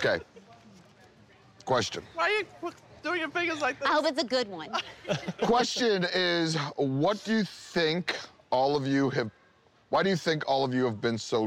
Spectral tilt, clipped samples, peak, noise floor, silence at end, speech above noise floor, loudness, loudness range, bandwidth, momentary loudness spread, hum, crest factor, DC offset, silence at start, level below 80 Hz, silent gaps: -4.5 dB/octave; under 0.1%; -16 dBFS; -62 dBFS; 0 s; 34 dB; -28 LUFS; 4 LU; 15 kHz; 8 LU; none; 12 dB; under 0.1%; 0 s; -66 dBFS; none